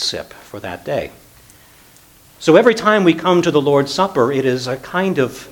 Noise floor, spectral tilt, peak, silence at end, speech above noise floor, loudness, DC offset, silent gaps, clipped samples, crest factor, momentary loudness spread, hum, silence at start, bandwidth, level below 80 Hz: -47 dBFS; -5 dB/octave; 0 dBFS; 0 s; 31 dB; -15 LUFS; under 0.1%; none; under 0.1%; 16 dB; 17 LU; none; 0 s; 19 kHz; -52 dBFS